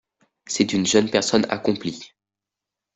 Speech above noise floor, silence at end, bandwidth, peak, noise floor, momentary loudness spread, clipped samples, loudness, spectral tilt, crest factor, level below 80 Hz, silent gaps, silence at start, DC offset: 66 dB; 0.9 s; 8.4 kHz; -4 dBFS; -87 dBFS; 12 LU; under 0.1%; -21 LUFS; -3.5 dB/octave; 20 dB; -60 dBFS; none; 0.5 s; under 0.1%